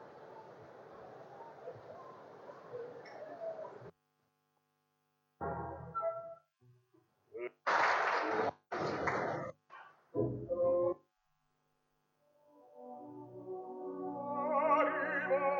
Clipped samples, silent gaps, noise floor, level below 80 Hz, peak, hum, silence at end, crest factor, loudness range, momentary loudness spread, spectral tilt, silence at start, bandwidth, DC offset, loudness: under 0.1%; none; -81 dBFS; -70 dBFS; -18 dBFS; none; 0 s; 20 dB; 14 LU; 23 LU; -6 dB/octave; 0 s; 7.6 kHz; under 0.1%; -36 LUFS